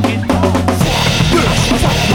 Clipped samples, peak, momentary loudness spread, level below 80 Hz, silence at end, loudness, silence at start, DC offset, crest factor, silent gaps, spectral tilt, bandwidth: under 0.1%; 0 dBFS; 2 LU; -24 dBFS; 0 s; -12 LUFS; 0 s; under 0.1%; 12 dB; none; -5 dB/octave; 18.5 kHz